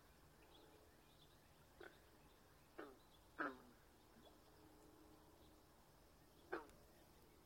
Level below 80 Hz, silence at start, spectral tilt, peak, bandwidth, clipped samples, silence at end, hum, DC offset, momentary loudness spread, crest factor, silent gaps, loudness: -76 dBFS; 0 s; -4.5 dB/octave; -32 dBFS; 16.5 kHz; under 0.1%; 0 s; none; under 0.1%; 19 LU; 30 dB; none; -60 LUFS